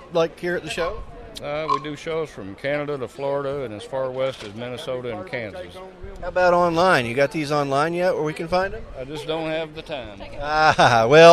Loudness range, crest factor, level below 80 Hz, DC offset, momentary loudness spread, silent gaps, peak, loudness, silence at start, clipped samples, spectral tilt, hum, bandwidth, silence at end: 7 LU; 22 dB; -46 dBFS; under 0.1%; 16 LU; none; 0 dBFS; -22 LUFS; 0 s; under 0.1%; -5 dB/octave; none; 13 kHz; 0 s